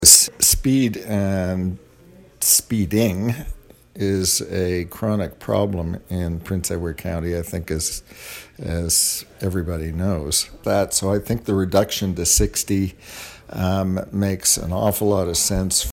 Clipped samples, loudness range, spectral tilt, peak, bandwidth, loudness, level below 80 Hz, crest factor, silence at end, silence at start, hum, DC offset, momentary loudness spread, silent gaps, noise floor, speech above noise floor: under 0.1%; 4 LU; -3.5 dB/octave; 0 dBFS; 16.5 kHz; -20 LUFS; -36 dBFS; 20 dB; 0 s; 0 s; none; under 0.1%; 11 LU; none; -48 dBFS; 26 dB